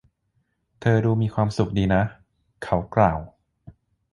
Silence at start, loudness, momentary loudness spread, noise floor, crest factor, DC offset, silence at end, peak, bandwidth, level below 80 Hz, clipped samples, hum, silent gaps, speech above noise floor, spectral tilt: 0.8 s; -23 LUFS; 8 LU; -71 dBFS; 22 dB; under 0.1%; 0.4 s; -2 dBFS; 11 kHz; -42 dBFS; under 0.1%; none; none; 50 dB; -8 dB/octave